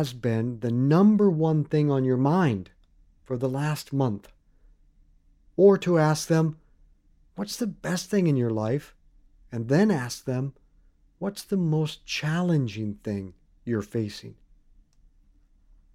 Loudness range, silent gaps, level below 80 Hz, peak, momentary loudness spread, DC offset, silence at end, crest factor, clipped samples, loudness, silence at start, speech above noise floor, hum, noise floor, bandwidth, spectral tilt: 7 LU; none; -58 dBFS; -6 dBFS; 15 LU; under 0.1%; 1.6 s; 20 dB; under 0.1%; -25 LUFS; 0 s; 36 dB; none; -60 dBFS; 15.5 kHz; -7 dB/octave